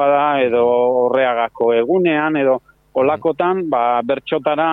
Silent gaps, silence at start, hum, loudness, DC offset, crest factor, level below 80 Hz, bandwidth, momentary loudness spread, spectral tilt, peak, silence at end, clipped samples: none; 0 s; none; -16 LUFS; under 0.1%; 12 dB; -58 dBFS; 4 kHz; 4 LU; -8.5 dB/octave; -2 dBFS; 0 s; under 0.1%